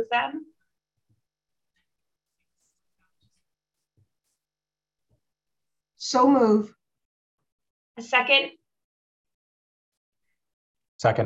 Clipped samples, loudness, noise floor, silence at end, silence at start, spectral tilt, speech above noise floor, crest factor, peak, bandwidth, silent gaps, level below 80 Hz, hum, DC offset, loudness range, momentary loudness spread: under 0.1%; -22 LUFS; under -90 dBFS; 0 s; 0 s; -4.5 dB/octave; over 68 dB; 24 dB; -6 dBFS; 8.2 kHz; 7.05-7.38 s, 7.52-7.59 s, 7.70-7.95 s, 8.84-9.25 s, 9.34-10.13 s, 10.53-10.75 s, 10.88-10.99 s; -70 dBFS; none; under 0.1%; 5 LU; 17 LU